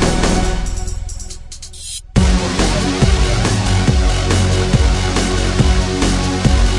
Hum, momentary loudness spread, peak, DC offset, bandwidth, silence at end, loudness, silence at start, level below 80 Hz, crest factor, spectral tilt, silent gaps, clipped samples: none; 13 LU; 0 dBFS; under 0.1%; 11.5 kHz; 0 s; -16 LUFS; 0 s; -18 dBFS; 14 dB; -5 dB/octave; none; under 0.1%